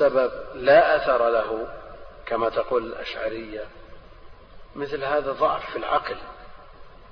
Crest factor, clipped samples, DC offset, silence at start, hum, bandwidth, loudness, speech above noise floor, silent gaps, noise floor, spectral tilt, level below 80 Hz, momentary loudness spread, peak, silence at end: 20 dB; under 0.1%; under 0.1%; 0 s; none; 6.2 kHz; -23 LUFS; 22 dB; none; -45 dBFS; -6.5 dB/octave; -48 dBFS; 21 LU; -4 dBFS; 0.15 s